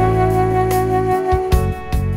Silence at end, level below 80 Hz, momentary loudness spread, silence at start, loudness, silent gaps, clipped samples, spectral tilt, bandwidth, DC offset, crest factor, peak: 0 s; -24 dBFS; 4 LU; 0 s; -17 LUFS; none; under 0.1%; -7.5 dB/octave; 16.5 kHz; under 0.1%; 16 dB; 0 dBFS